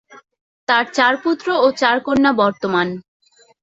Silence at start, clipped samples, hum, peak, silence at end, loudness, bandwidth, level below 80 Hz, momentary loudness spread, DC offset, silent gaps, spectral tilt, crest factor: 0.1 s; under 0.1%; none; -2 dBFS; 0.6 s; -17 LUFS; 8 kHz; -58 dBFS; 7 LU; under 0.1%; 0.41-0.67 s; -4.5 dB/octave; 16 dB